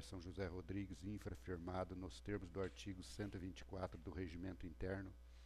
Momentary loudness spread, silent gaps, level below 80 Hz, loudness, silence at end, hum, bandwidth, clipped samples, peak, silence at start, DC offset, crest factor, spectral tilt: 5 LU; none; -60 dBFS; -50 LUFS; 0 s; none; 13.5 kHz; under 0.1%; -32 dBFS; 0 s; under 0.1%; 16 dB; -6.5 dB/octave